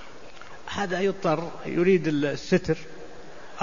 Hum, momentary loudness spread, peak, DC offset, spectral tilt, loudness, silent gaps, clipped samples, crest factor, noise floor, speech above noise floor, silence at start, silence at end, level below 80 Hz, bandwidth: none; 23 LU; -8 dBFS; 1%; -6.5 dB/octave; -26 LUFS; none; under 0.1%; 18 dB; -45 dBFS; 21 dB; 0 s; 0 s; -54 dBFS; 7.4 kHz